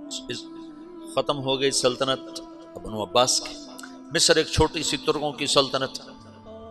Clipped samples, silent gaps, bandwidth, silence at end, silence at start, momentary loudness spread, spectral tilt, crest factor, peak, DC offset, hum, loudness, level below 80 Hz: under 0.1%; none; 14.5 kHz; 0 s; 0 s; 21 LU; -2.5 dB/octave; 22 dB; -4 dBFS; under 0.1%; none; -23 LUFS; -44 dBFS